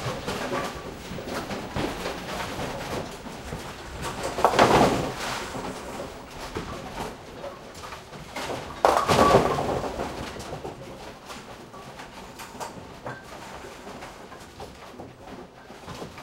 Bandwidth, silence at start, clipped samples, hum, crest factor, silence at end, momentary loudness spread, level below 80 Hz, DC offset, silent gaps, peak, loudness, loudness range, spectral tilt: 16 kHz; 0 s; under 0.1%; none; 28 dB; 0 s; 21 LU; -46 dBFS; under 0.1%; none; 0 dBFS; -27 LUFS; 15 LU; -4.5 dB/octave